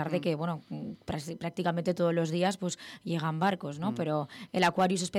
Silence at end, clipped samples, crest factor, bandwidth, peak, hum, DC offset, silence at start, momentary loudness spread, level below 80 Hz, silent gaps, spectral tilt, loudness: 0 s; under 0.1%; 16 dB; 14 kHz; -14 dBFS; none; under 0.1%; 0 s; 10 LU; -66 dBFS; none; -5.5 dB/octave; -31 LUFS